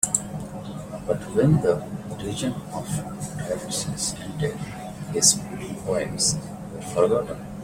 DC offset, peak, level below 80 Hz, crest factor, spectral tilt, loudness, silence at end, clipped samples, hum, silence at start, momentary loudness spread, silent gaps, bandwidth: under 0.1%; -2 dBFS; -48 dBFS; 24 dB; -4 dB/octave; -25 LUFS; 0 s; under 0.1%; none; 0 s; 15 LU; none; 16.5 kHz